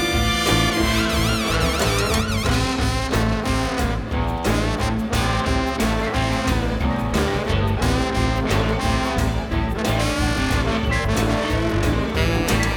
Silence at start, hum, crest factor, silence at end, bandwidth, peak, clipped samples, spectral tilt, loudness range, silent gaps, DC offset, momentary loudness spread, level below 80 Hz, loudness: 0 s; none; 16 dB; 0 s; over 20 kHz; -4 dBFS; under 0.1%; -5 dB/octave; 2 LU; none; under 0.1%; 3 LU; -26 dBFS; -21 LUFS